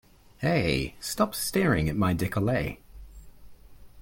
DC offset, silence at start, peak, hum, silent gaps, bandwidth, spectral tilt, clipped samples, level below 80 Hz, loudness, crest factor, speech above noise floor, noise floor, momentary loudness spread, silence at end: under 0.1%; 0.4 s; -10 dBFS; none; none; 17 kHz; -5.5 dB/octave; under 0.1%; -46 dBFS; -27 LUFS; 18 dB; 22 dB; -48 dBFS; 8 LU; 0 s